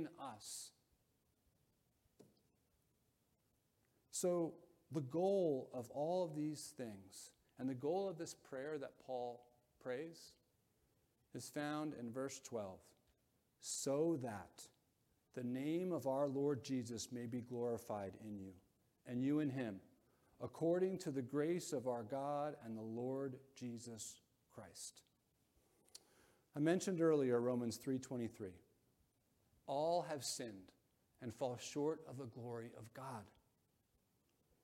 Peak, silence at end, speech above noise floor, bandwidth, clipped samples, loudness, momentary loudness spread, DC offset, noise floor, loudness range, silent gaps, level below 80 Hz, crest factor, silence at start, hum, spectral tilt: -24 dBFS; 1.35 s; 39 dB; 16.5 kHz; under 0.1%; -44 LUFS; 17 LU; under 0.1%; -82 dBFS; 8 LU; none; -84 dBFS; 20 dB; 0 s; none; -5.5 dB/octave